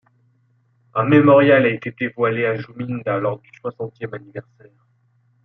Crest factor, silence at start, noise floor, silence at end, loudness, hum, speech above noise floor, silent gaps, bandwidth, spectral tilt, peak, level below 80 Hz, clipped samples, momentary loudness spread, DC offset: 18 dB; 0.95 s; -61 dBFS; 1.05 s; -18 LUFS; none; 43 dB; none; 5.4 kHz; -9.5 dB/octave; -2 dBFS; -64 dBFS; under 0.1%; 20 LU; under 0.1%